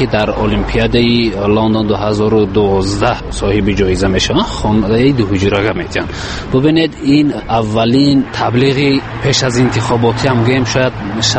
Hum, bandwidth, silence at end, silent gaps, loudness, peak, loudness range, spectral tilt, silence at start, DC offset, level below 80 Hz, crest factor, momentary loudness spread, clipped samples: none; 8.8 kHz; 0 s; none; -13 LUFS; 0 dBFS; 1 LU; -5.5 dB/octave; 0 s; under 0.1%; -28 dBFS; 12 dB; 5 LU; under 0.1%